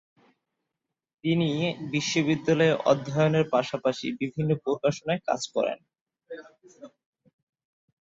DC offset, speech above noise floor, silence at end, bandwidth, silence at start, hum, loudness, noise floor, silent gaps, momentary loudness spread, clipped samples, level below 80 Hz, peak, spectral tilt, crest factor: under 0.1%; 60 dB; 1.25 s; 7.8 kHz; 1.25 s; none; -26 LUFS; -85 dBFS; 6.01-6.06 s; 10 LU; under 0.1%; -66 dBFS; -8 dBFS; -5.5 dB/octave; 20 dB